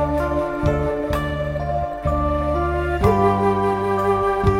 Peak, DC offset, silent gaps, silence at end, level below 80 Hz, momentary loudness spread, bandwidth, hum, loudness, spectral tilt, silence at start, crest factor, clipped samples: -4 dBFS; under 0.1%; none; 0 s; -30 dBFS; 6 LU; 16.5 kHz; none; -20 LUFS; -8 dB/octave; 0 s; 16 dB; under 0.1%